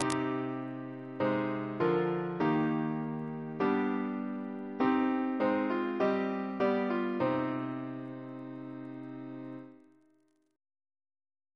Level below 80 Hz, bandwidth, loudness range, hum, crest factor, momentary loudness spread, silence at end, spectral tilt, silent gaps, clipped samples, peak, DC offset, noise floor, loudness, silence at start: -74 dBFS; 11 kHz; 13 LU; none; 22 dB; 14 LU; 1.8 s; -7 dB/octave; none; under 0.1%; -10 dBFS; under 0.1%; -71 dBFS; -33 LUFS; 0 s